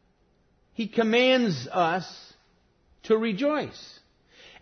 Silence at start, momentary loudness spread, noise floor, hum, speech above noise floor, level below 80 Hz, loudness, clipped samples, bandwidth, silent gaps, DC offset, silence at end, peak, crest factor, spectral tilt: 0.8 s; 22 LU; -65 dBFS; none; 41 dB; -68 dBFS; -25 LUFS; under 0.1%; 6.6 kHz; none; under 0.1%; 0.7 s; -10 dBFS; 18 dB; -5.5 dB/octave